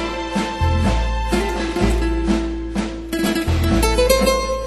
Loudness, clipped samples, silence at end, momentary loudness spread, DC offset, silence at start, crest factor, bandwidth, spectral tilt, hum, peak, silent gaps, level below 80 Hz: -19 LUFS; under 0.1%; 0 s; 8 LU; under 0.1%; 0 s; 16 dB; 13.5 kHz; -5 dB/octave; none; -2 dBFS; none; -24 dBFS